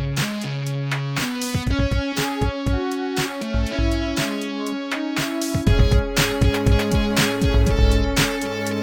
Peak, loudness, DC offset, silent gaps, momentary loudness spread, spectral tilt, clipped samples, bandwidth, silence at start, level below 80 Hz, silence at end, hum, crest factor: -4 dBFS; -21 LUFS; under 0.1%; none; 6 LU; -5 dB/octave; under 0.1%; 19 kHz; 0 s; -24 dBFS; 0 s; none; 16 dB